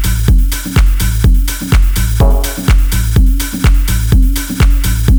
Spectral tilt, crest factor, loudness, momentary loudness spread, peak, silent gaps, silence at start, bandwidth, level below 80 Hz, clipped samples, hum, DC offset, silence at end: -5 dB/octave; 10 dB; -13 LUFS; 2 LU; 0 dBFS; none; 0 s; over 20 kHz; -10 dBFS; under 0.1%; none; under 0.1%; 0 s